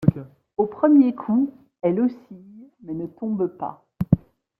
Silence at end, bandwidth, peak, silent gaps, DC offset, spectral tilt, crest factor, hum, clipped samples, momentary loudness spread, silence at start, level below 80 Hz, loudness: 0.4 s; 3.4 kHz; -2 dBFS; none; under 0.1%; -12 dB/octave; 20 dB; none; under 0.1%; 17 LU; 0 s; -50 dBFS; -22 LUFS